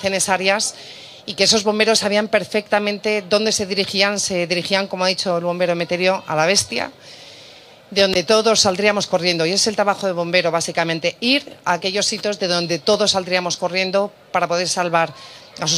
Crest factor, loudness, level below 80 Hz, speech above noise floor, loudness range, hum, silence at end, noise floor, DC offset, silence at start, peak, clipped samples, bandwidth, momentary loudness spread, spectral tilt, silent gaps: 18 dB; -18 LUFS; -60 dBFS; 25 dB; 2 LU; none; 0 s; -43 dBFS; under 0.1%; 0 s; 0 dBFS; under 0.1%; 15.5 kHz; 8 LU; -2.5 dB/octave; none